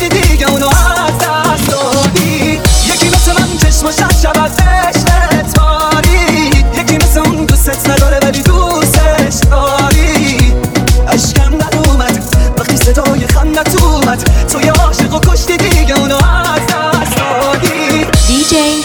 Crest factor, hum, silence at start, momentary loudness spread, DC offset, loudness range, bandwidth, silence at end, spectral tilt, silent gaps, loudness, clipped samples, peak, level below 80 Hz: 8 dB; none; 0 s; 3 LU; under 0.1%; 1 LU; over 20 kHz; 0 s; -4.5 dB/octave; none; -9 LUFS; 0.2%; 0 dBFS; -12 dBFS